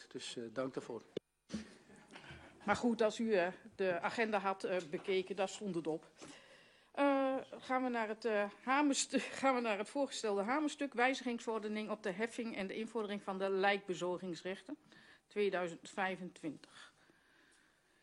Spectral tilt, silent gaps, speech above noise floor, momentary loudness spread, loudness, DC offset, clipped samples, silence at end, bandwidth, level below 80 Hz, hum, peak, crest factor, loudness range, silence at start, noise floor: -4 dB/octave; none; 33 dB; 16 LU; -38 LUFS; under 0.1%; under 0.1%; 1.15 s; 11.5 kHz; -78 dBFS; none; -18 dBFS; 20 dB; 5 LU; 0 s; -71 dBFS